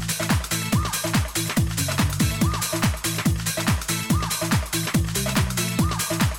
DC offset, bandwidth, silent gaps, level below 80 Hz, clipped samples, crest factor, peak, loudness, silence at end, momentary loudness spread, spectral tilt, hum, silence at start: 0.1%; over 20 kHz; none; -34 dBFS; under 0.1%; 12 dB; -12 dBFS; -23 LUFS; 0 s; 1 LU; -4 dB/octave; none; 0 s